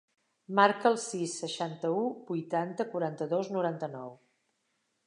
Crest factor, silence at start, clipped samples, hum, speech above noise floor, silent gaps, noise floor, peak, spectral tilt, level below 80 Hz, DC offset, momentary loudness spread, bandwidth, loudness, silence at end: 24 dB; 0.5 s; under 0.1%; none; 47 dB; none; -78 dBFS; -8 dBFS; -4.5 dB/octave; -88 dBFS; under 0.1%; 12 LU; 11 kHz; -31 LUFS; 0.9 s